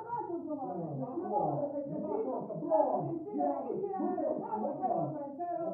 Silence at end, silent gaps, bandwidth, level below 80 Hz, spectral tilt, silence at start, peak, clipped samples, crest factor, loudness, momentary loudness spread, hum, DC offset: 0 s; none; 2.8 kHz; -78 dBFS; -12 dB/octave; 0 s; -16 dBFS; under 0.1%; 18 dB; -35 LUFS; 7 LU; none; under 0.1%